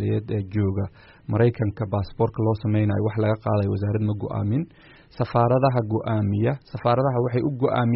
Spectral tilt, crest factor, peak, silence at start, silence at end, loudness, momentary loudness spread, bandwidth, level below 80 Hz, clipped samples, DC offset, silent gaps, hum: -8 dB/octave; 16 dB; -6 dBFS; 0 s; 0 s; -24 LUFS; 6 LU; 5.6 kHz; -50 dBFS; under 0.1%; under 0.1%; none; none